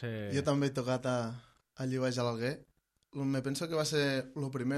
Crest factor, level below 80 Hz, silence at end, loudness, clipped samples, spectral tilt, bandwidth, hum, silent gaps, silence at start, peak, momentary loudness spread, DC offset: 16 dB; -68 dBFS; 0 s; -34 LUFS; under 0.1%; -5.5 dB/octave; 14 kHz; none; none; 0 s; -18 dBFS; 10 LU; under 0.1%